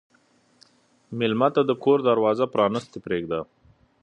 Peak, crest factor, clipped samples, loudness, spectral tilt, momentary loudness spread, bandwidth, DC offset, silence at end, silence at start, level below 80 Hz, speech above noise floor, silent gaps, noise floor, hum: -6 dBFS; 20 dB; under 0.1%; -23 LUFS; -7 dB/octave; 11 LU; 8.8 kHz; under 0.1%; 0.6 s; 1.1 s; -62 dBFS; 40 dB; none; -62 dBFS; none